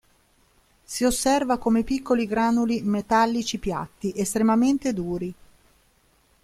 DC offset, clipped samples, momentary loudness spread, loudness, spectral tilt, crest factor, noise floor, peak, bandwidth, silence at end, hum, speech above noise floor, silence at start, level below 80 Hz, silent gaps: under 0.1%; under 0.1%; 9 LU; -23 LUFS; -4.5 dB/octave; 16 dB; -62 dBFS; -8 dBFS; 15 kHz; 1.1 s; none; 39 dB; 0.9 s; -48 dBFS; none